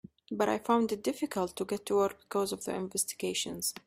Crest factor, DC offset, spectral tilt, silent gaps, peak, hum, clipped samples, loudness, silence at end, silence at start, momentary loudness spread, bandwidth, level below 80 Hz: 18 dB; under 0.1%; -3.5 dB/octave; none; -14 dBFS; none; under 0.1%; -32 LUFS; 0.05 s; 0.3 s; 6 LU; 16 kHz; -68 dBFS